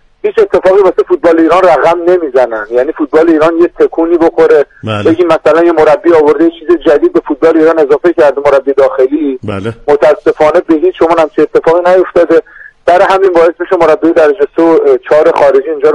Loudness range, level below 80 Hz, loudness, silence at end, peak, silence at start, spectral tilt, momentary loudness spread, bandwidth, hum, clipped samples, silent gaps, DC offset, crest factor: 1 LU; -40 dBFS; -8 LUFS; 0 s; 0 dBFS; 0.25 s; -6.5 dB/octave; 5 LU; 10.5 kHz; none; 0.9%; none; under 0.1%; 8 dB